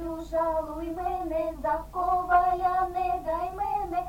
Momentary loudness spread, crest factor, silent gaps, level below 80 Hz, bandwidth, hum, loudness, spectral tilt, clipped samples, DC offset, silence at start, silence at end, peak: 8 LU; 16 dB; none; -44 dBFS; 17 kHz; none; -28 LUFS; -6.5 dB/octave; under 0.1%; under 0.1%; 0 s; 0 s; -12 dBFS